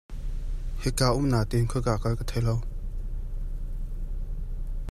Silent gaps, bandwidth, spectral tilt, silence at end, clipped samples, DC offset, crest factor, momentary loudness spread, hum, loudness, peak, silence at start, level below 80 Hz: none; 14 kHz; -6 dB/octave; 0 s; under 0.1%; under 0.1%; 18 dB; 14 LU; none; -30 LUFS; -10 dBFS; 0.1 s; -32 dBFS